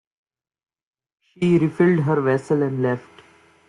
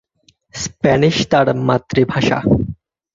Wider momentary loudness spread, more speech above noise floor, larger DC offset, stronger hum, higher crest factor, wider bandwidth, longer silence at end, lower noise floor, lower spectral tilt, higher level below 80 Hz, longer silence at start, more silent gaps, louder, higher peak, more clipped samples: second, 7 LU vs 12 LU; second, 32 dB vs 43 dB; neither; neither; about the same, 16 dB vs 16 dB; first, 10.5 kHz vs 7.8 kHz; first, 0.7 s vs 0.4 s; second, -52 dBFS vs -57 dBFS; first, -8.5 dB/octave vs -5.5 dB/octave; second, -62 dBFS vs -40 dBFS; first, 1.4 s vs 0.55 s; neither; second, -20 LUFS vs -16 LUFS; second, -6 dBFS vs -2 dBFS; neither